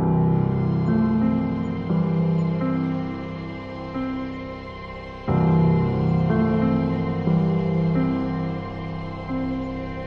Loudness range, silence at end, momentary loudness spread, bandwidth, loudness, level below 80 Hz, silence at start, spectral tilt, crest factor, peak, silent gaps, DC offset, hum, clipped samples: 5 LU; 0 s; 12 LU; 5.4 kHz; -23 LUFS; -42 dBFS; 0 s; -10.5 dB/octave; 14 dB; -8 dBFS; none; under 0.1%; none; under 0.1%